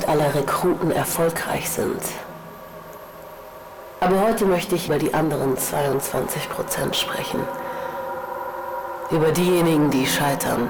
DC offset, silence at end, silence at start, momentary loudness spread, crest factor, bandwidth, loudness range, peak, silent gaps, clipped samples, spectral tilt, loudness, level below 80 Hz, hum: under 0.1%; 0 s; 0 s; 20 LU; 12 dB; over 20 kHz; 4 LU; -10 dBFS; none; under 0.1%; -4.5 dB/octave; -22 LUFS; -48 dBFS; none